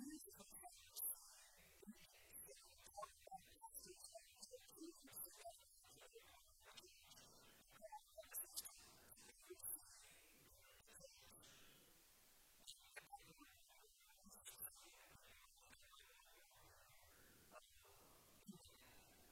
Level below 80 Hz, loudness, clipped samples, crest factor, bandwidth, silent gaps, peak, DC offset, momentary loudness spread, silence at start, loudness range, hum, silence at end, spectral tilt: -82 dBFS; -59 LUFS; under 0.1%; 30 dB; 16.5 kHz; none; -32 dBFS; under 0.1%; 16 LU; 0 s; 10 LU; none; 0 s; -1.5 dB/octave